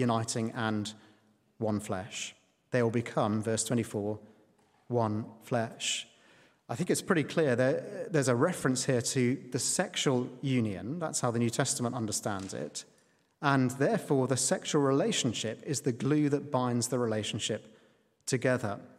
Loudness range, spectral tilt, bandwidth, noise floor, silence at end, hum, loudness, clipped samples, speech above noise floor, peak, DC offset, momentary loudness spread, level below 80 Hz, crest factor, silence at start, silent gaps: 4 LU; -4.5 dB/octave; 15.5 kHz; -66 dBFS; 0.1 s; none; -31 LUFS; under 0.1%; 36 dB; -10 dBFS; under 0.1%; 9 LU; -74 dBFS; 22 dB; 0 s; none